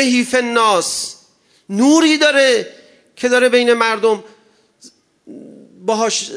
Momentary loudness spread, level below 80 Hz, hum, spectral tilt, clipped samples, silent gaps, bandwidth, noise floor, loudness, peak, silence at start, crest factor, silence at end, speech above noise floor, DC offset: 12 LU; -66 dBFS; none; -2.5 dB/octave; under 0.1%; none; 11 kHz; -54 dBFS; -14 LUFS; 0 dBFS; 0 s; 16 dB; 0 s; 40 dB; under 0.1%